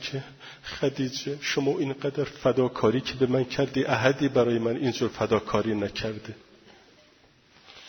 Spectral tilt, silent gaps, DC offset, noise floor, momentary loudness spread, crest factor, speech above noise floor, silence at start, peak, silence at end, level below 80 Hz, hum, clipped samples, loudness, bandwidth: -5.5 dB/octave; none; under 0.1%; -59 dBFS; 11 LU; 22 dB; 33 dB; 0 s; -4 dBFS; 0 s; -56 dBFS; none; under 0.1%; -26 LUFS; 17 kHz